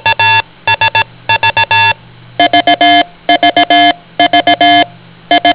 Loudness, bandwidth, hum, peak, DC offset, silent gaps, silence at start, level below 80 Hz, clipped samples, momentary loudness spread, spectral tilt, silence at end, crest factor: -8 LUFS; 4 kHz; none; 0 dBFS; 0.4%; none; 0.05 s; -44 dBFS; 2%; 6 LU; -7 dB/octave; 0 s; 10 dB